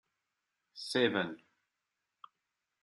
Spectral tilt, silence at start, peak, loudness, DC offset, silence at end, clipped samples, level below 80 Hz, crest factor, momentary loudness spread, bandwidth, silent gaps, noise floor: -4.5 dB/octave; 0.75 s; -16 dBFS; -33 LUFS; under 0.1%; 1.45 s; under 0.1%; -84 dBFS; 24 dB; 22 LU; 12 kHz; none; -87 dBFS